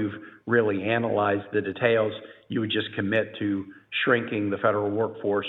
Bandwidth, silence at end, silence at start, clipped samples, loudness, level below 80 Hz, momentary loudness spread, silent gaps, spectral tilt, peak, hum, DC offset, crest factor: 4.1 kHz; 0 s; 0 s; under 0.1%; -26 LUFS; -72 dBFS; 8 LU; none; -8.5 dB/octave; -6 dBFS; none; under 0.1%; 20 dB